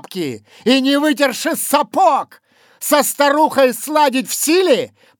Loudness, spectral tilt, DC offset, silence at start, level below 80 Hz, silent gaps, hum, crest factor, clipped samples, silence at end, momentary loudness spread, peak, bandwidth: -15 LUFS; -2.5 dB/octave; under 0.1%; 0.1 s; -80 dBFS; none; none; 16 dB; under 0.1%; 0.3 s; 10 LU; 0 dBFS; over 20 kHz